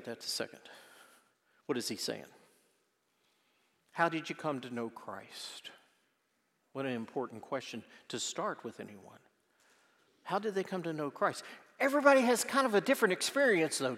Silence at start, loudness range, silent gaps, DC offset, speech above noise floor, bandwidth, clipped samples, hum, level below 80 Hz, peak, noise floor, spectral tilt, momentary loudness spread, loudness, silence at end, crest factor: 0 s; 12 LU; none; under 0.1%; 44 dB; 16 kHz; under 0.1%; none; under -90 dBFS; -10 dBFS; -78 dBFS; -3.5 dB/octave; 20 LU; -33 LUFS; 0 s; 24 dB